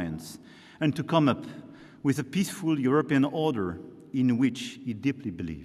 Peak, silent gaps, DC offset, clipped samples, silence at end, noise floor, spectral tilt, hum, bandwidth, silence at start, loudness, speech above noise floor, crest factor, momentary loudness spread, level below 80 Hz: -10 dBFS; none; under 0.1%; under 0.1%; 0 s; -48 dBFS; -6.5 dB/octave; none; 13.5 kHz; 0 s; -28 LUFS; 22 dB; 18 dB; 15 LU; -60 dBFS